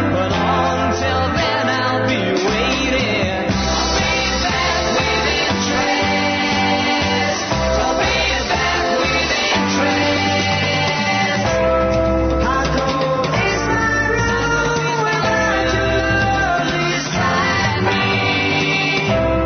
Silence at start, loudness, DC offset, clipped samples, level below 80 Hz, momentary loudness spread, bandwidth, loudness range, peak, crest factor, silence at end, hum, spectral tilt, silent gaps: 0 s; -16 LUFS; under 0.1%; under 0.1%; -32 dBFS; 2 LU; 6.6 kHz; 1 LU; -6 dBFS; 12 dB; 0 s; none; -4 dB/octave; none